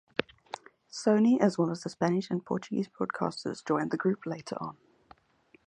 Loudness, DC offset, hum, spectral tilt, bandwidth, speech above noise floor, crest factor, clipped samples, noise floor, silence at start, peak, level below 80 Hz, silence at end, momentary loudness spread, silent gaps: -30 LUFS; under 0.1%; none; -6.5 dB/octave; 10 kHz; 35 dB; 24 dB; under 0.1%; -64 dBFS; 0.2 s; -8 dBFS; -72 dBFS; 0.95 s; 18 LU; none